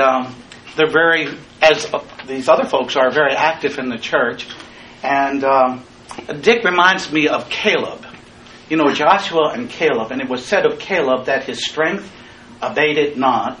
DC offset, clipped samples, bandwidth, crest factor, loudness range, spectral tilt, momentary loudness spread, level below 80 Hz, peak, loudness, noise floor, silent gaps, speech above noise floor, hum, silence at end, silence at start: under 0.1%; under 0.1%; 10.5 kHz; 18 dB; 3 LU; -4 dB/octave; 15 LU; -54 dBFS; 0 dBFS; -16 LUFS; -41 dBFS; none; 24 dB; none; 0 s; 0 s